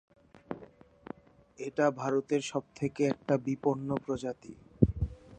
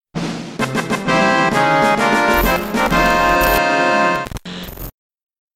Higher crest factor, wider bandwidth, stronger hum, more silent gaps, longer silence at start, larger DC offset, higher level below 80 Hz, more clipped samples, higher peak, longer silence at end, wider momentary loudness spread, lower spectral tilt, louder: first, 28 dB vs 16 dB; second, 9.6 kHz vs 17.5 kHz; neither; neither; first, 0.5 s vs 0.15 s; neither; second, -48 dBFS vs -32 dBFS; neither; second, -6 dBFS vs 0 dBFS; second, 0 s vs 0.65 s; first, 19 LU vs 15 LU; first, -7 dB/octave vs -4.5 dB/octave; second, -32 LUFS vs -15 LUFS